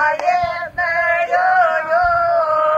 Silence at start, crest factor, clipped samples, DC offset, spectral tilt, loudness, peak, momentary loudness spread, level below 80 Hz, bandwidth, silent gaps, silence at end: 0 s; 12 dB; under 0.1%; under 0.1%; -4 dB/octave; -16 LUFS; -4 dBFS; 5 LU; -46 dBFS; 7.8 kHz; none; 0 s